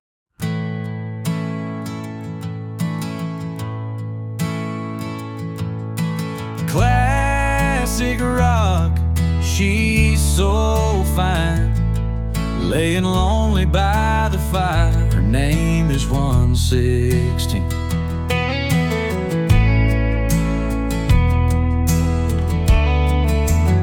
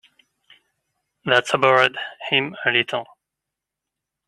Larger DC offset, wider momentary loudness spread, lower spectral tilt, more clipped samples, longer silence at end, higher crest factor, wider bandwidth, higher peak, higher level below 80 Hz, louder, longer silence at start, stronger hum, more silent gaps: neither; second, 11 LU vs 14 LU; first, -6 dB/octave vs -3.5 dB/octave; neither; second, 0 s vs 1.25 s; second, 14 dB vs 24 dB; first, 17.5 kHz vs 12.5 kHz; second, -4 dBFS vs 0 dBFS; first, -22 dBFS vs -68 dBFS; about the same, -19 LUFS vs -19 LUFS; second, 0.4 s vs 1.25 s; neither; neither